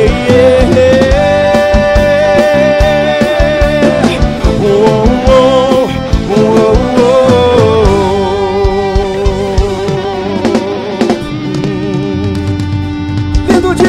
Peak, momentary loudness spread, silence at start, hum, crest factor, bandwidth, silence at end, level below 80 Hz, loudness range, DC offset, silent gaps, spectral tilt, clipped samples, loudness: 0 dBFS; 8 LU; 0 s; none; 8 dB; 15 kHz; 0 s; -18 dBFS; 6 LU; under 0.1%; none; -6.5 dB/octave; 0.9%; -9 LUFS